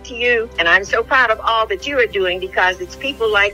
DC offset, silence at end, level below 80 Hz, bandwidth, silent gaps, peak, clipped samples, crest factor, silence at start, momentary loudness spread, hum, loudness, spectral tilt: under 0.1%; 0 s; -40 dBFS; 16 kHz; none; 0 dBFS; under 0.1%; 16 dB; 0 s; 6 LU; none; -16 LUFS; -3 dB/octave